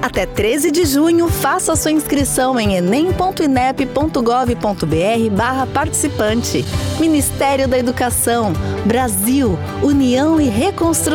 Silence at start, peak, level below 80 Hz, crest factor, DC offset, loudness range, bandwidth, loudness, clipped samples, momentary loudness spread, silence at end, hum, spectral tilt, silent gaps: 0 s; -6 dBFS; -34 dBFS; 10 dB; under 0.1%; 1 LU; 18.5 kHz; -15 LUFS; under 0.1%; 4 LU; 0 s; none; -4.5 dB/octave; none